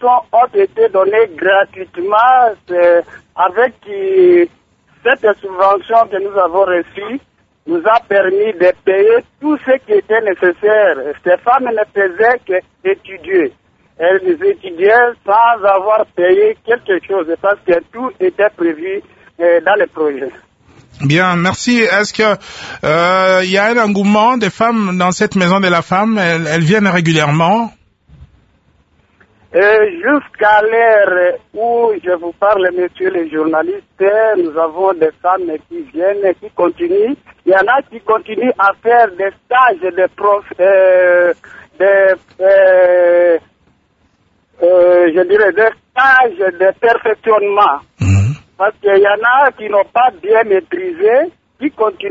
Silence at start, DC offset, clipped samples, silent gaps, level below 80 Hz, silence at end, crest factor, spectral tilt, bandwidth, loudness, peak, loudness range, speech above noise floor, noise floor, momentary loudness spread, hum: 0 s; under 0.1%; under 0.1%; none; -44 dBFS; 0 s; 12 dB; -6 dB/octave; 8 kHz; -12 LUFS; 0 dBFS; 4 LU; 45 dB; -56 dBFS; 8 LU; none